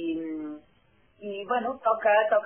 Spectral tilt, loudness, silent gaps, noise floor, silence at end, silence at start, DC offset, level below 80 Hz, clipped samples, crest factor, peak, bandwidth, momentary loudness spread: -2 dB/octave; -27 LUFS; none; -64 dBFS; 0 s; 0 s; under 0.1%; -72 dBFS; under 0.1%; 16 dB; -10 dBFS; 3.4 kHz; 19 LU